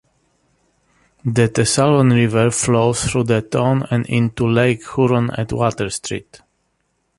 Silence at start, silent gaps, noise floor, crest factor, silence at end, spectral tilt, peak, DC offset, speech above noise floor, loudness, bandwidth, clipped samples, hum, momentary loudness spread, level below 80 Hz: 1.25 s; none; -67 dBFS; 16 dB; 1 s; -5.5 dB/octave; -2 dBFS; under 0.1%; 51 dB; -17 LUFS; 11.5 kHz; under 0.1%; none; 9 LU; -44 dBFS